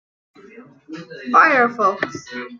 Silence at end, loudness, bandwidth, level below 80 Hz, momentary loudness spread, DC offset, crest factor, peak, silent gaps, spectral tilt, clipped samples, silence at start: 0.05 s; -16 LUFS; 7.4 kHz; -70 dBFS; 23 LU; under 0.1%; 18 dB; -2 dBFS; none; -4.5 dB/octave; under 0.1%; 0.55 s